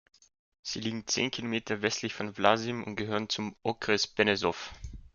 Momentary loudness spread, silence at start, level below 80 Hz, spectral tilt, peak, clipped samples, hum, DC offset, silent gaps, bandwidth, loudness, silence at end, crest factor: 11 LU; 0.65 s; -56 dBFS; -3.5 dB/octave; -6 dBFS; under 0.1%; none; under 0.1%; none; 7.4 kHz; -30 LUFS; 0.1 s; 26 dB